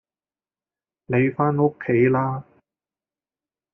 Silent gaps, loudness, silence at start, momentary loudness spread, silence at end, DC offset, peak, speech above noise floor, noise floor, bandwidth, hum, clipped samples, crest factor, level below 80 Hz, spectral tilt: none; -21 LUFS; 1.1 s; 7 LU; 1.3 s; under 0.1%; -6 dBFS; over 70 dB; under -90 dBFS; 3.4 kHz; none; under 0.1%; 18 dB; -62 dBFS; -9 dB/octave